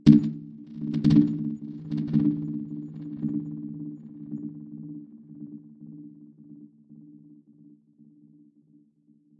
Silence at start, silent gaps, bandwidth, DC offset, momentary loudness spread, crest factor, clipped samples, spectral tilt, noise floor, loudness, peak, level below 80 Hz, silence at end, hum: 0.05 s; none; 6.4 kHz; under 0.1%; 26 LU; 26 dB; under 0.1%; -9.5 dB/octave; -62 dBFS; -27 LUFS; -2 dBFS; -60 dBFS; 2.2 s; none